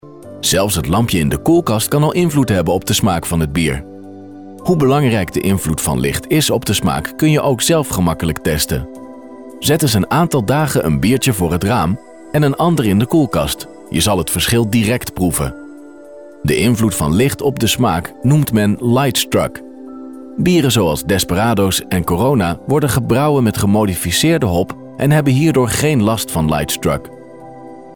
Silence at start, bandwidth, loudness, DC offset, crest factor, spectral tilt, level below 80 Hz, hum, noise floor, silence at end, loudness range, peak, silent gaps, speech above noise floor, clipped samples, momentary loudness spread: 0.05 s; 18 kHz; -15 LUFS; 0.4%; 12 dB; -5 dB/octave; -34 dBFS; none; -36 dBFS; 0 s; 2 LU; -4 dBFS; none; 22 dB; under 0.1%; 11 LU